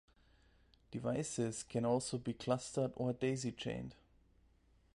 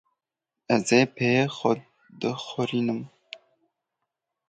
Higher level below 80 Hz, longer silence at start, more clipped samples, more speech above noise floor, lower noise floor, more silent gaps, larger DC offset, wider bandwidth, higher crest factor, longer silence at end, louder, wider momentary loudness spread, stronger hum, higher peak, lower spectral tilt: about the same, -68 dBFS vs -68 dBFS; first, 0.9 s vs 0.7 s; neither; second, 32 dB vs 63 dB; second, -70 dBFS vs -87 dBFS; neither; neither; first, 11.5 kHz vs 9.4 kHz; about the same, 18 dB vs 22 dB; second, 1 s vs 1.4 s; second, -39 LUFS vs -25 LUFS; second, 7 LU vs 21 LU; neither; second, -22 dBFS vs -6 dBFS; about the same, -5.5 dB/octave vs -5 dB/octave